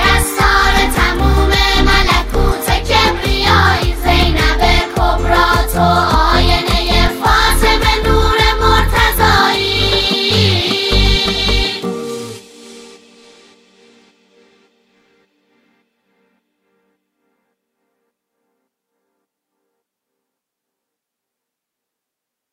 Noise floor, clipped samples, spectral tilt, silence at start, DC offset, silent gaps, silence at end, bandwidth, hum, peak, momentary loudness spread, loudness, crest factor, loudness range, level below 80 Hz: -81 dBFS; under 0.1%; -4 dB/octave; 0 s; under 0.1%; none; 9.65 s; 16 kHz; none; 0 dBFS; 5 LU; -12 LUFS; 14 dB; 6 LU; -20 dBFS